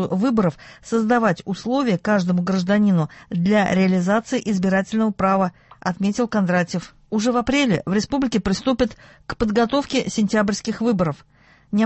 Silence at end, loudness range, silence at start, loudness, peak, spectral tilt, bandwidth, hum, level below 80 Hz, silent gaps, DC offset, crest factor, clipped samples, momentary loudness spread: 0 s; 2 LU; 0 s; -20 LUFS; -4 dBFS; -6 dB/octave; 8.4 kHz; none; -46 dBFS; none; under 0.1%; 16 dB; under 0.1%; 8 LU